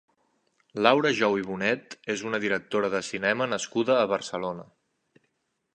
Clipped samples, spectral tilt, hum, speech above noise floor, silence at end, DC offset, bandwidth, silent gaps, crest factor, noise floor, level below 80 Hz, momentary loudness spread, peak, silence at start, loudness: under 0.1%; -4 dB/octave; none; 50 dB; 1.1 s; under 0.1%; 9.8 kHz; none; 26 dB; -76 dBFS; -70 dBFS; 11 LU; -2 dBFS; 0.75 s; -26 LUFS